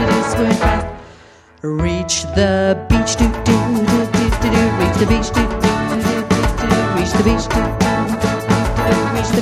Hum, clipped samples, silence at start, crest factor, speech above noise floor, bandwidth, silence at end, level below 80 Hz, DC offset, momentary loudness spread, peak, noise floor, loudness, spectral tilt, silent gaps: none; under 0.1%; 0 s; 14 dB; 29 dB; 15.5 kHz; 0 s; -26 dBFS; under 0.1%; 4 LU; 0 dBFS; -44 dBFS; -16 LUFS; -5.5 dB/octave; none